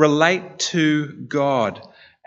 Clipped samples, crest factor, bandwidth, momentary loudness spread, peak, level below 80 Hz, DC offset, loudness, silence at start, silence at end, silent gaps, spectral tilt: under 0.1%; 20 dB; 8 kHz; 9 LU; 0 dBFS; -68 dBFS; under 0.1%; -20 LUFS; 0 s; 0.45 s; none; -4.5 dB/octave